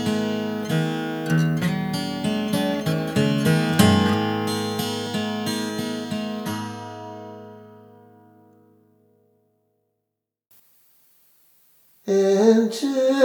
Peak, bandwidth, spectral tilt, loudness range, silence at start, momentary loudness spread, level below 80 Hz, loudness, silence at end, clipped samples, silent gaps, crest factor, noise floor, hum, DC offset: -2 dBFS; over 20 kHz; -5.5 dB/octave; 14 LU; 0 s; 17 LU; -60 dBFS; -22 LUFS; 0 s; under 0.1%; none; 22 dB; -82 dBFS; 50 Hz at -55 dBFS; under 0.1%